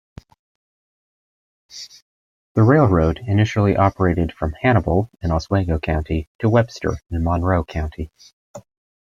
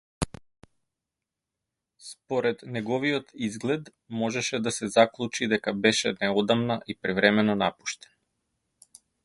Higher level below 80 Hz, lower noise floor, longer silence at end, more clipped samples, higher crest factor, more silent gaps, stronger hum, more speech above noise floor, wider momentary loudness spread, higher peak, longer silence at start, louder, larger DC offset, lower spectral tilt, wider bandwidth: first, -36 dBFS vs -56 dBFS; about the same, under -90 dBFS vs -87 dBFS; second, 0.45 s vs 1.3 s; neither; second, 18 dB vs 26 dB; first, 2.02-2.55 s, 6.27-6.39 s, 8.33-8.54 s vs none; neither; first, over 72 dB vs 61 dB; first, 17 LU vs 13 LU; about the same, -2 dBFS vs -2 dBFS; first, 1.75 s vs 0.2 s; first, -19 LUFS vs -26 LUFS; neither; first, -8 dB/octave vs -4 dB/octave; second, 7.4 kHz vs 11.5 kHz